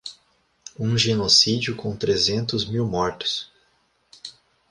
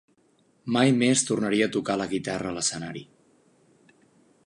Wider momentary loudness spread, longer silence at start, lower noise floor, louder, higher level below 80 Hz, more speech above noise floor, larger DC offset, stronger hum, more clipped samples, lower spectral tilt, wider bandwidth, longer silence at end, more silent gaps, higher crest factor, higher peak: first, 25 LU vs 16 LU; second, 0.05 s vs 0.65 s; about the same, -65 dBFS vs -64 dBFS; first, -21 LUFS vs -25 LUFS; first, -52 dBFS vs -64 dBFS; about the same, 43 dB vs 40 dB; neither; neither; neither; about the same, -4 dB/octave vs -4 dB/octave; about the same, 11.5 kHz vs 11.5 kHz; second, 0.4 s vs 1.4 s; neither; about the same, 22 dB vs 20 dB; about the same, -4 dBFS vs -6 dBFS